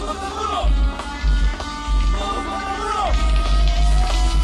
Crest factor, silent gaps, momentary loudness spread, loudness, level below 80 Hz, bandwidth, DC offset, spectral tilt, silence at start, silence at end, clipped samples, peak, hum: 14 dB; none; 5 LU; -21 LUFS; -18 dBFS; 11 kHz; under 0.1%; -5 dB/octave; 0 s; 0 s; under 0.1%; -4 dBFS; none